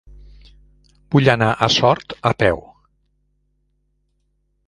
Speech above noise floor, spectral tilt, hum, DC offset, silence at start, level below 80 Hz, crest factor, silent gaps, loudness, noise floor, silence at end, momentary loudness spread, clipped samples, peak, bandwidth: 50 dB; -5.5 dB/octave; 50 Hz at -50 dBFS; under 0.1%; 1.1 s; -46 dBFS; 20 dB; none; -17 LUFS; -67 dBFS; 2.1 s; 6 LU; under 0.1%; 0 dBFS; 11 kHz